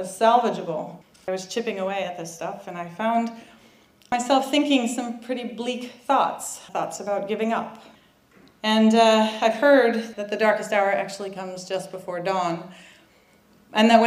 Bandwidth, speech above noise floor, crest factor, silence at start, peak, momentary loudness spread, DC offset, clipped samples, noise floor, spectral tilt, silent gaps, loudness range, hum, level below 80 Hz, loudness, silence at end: 15.5 kHz; 34 dB; 20 dB; 0 s; -4 dBFS; 15 LU; under 0.1%; under 0.1%; -57 dBFS; -4 dB/octave; none; 8 LU; none; -70 dBFS; -23 LUFS; 0 s